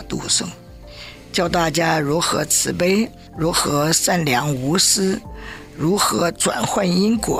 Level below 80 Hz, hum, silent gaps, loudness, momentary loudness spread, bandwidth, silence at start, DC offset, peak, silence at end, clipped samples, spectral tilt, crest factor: -42 dBFS; none; none; -18 LUFS; 13 LU; 16 kHz; 0 s; under 0.1%; -4 dBFS; 0 s; under 0.1%; -3.5 dB/octave; 16 dB